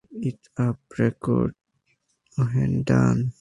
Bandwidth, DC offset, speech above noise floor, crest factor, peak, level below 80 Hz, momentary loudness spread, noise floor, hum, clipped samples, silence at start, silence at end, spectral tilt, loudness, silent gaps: 11 kHz; under 0.1%; 47 dB; 18 dB; -6 dBFS; -48 dBFS; 11 LU; -70 dBFS; none; under 0.1%; 0.1 s; 0.1 s; -8.5 dB/octave; -24 LUFS; none